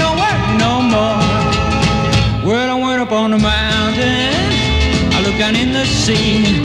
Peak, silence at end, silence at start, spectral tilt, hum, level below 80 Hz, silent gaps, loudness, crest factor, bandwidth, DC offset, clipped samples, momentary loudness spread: 0 dBFS; 0 s; 0 s; -5 dB/octave; none; -26 dBFS; none; -14 LUFS; 12 dB; 12 kHz; 0.2%; under 0.1%; 2 LU